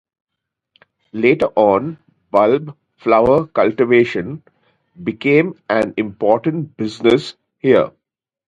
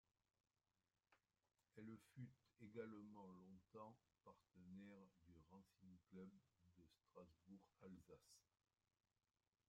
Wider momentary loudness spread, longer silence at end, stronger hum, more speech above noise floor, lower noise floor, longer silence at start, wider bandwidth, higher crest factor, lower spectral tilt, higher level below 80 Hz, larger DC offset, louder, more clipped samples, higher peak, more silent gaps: first, 13 LU vs 10 LU; second, 0.6 s vs 1.25 s; neither; first, 65 dB vs 22 dB; second, -80 dBFS vs -86 dBFS; about the same, 1.15 s vs 1.1 s; about the same, 9.2 kHz vs 9.4 kHz; second, 16 dB vs 22 dB; about the same, -7.5 dB/octave vs -7 dB/octave; first, -52 dBFS vs under -90 dBFS; neither; first, -16 LUFS vs -64 LUFS; neither; first, 0 dBFS vs -44 dBFS; neither